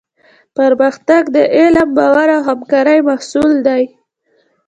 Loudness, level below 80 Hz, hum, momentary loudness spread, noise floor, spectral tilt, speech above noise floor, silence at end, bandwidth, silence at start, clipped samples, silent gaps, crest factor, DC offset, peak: -11 LUFS; -50 dBFS; none; 6 LU; -58 dBFS; -5 dB/octave; 48 dB; 0.8 s; 9.2 kHz; 0.6 s; under 0.1%; none; 12 dB; under 0.1%; 0 dBFS